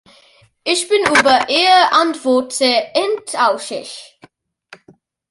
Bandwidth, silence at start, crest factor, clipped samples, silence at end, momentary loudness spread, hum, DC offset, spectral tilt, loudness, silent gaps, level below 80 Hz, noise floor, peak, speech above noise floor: 11.5 kHz; 0.65 s; 16 dB; under 0.1%; 1.25 s; 15 LU; none; under 0.1%; -1.5 dB/octave; -14 LUFS; none; -60 dBFS; -51 dBFS; 0 dBFS; 36 dB